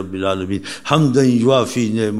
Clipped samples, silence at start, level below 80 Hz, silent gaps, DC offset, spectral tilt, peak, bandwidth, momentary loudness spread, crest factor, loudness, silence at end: under 0.1%; 0 s; -54 dBFS; none; 0.7%; -6 dB/octave; 0 dBFS; 13.5 kHz; 9 LU; 16 dB; -17 LUFS; 0 s